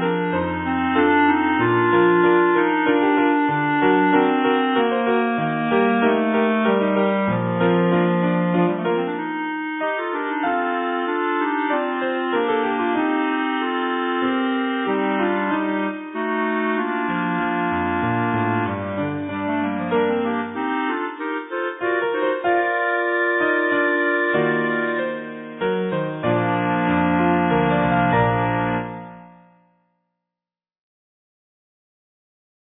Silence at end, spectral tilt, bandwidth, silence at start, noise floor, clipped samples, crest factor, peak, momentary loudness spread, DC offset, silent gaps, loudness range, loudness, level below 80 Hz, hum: 3.4 s; -10.5 dB/octave; 4 kHz; 0 s; under -90 dBFS; under 0.1%; 16 dB; -4 dBFS; 7 LU; under 0.1%; none; 5 LU; -20 LUFS; -54 dBFS; none